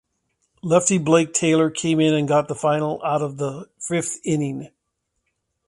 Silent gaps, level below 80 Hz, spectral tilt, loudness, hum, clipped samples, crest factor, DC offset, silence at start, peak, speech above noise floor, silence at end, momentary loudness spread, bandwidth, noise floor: none; -62 dBFS; -5 dB/octave; -20 LUFS; none; under 0.1%; 20 dB; under 0.1%; 0.65 s; -2 dBFS; 56 dB; 1 s; 11 LU; 11.5 kHz; -76 dBFS